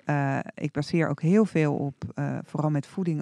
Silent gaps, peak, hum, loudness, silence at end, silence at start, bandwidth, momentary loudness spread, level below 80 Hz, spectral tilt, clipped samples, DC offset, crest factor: none; -10 dBFS; none; -27 LUFS; 0 s; 0.05 s; 10.5 kHz; 10 LU; -64 dBFS; -8 dB/octave; under 0.1%; under 0.1%; 16 dB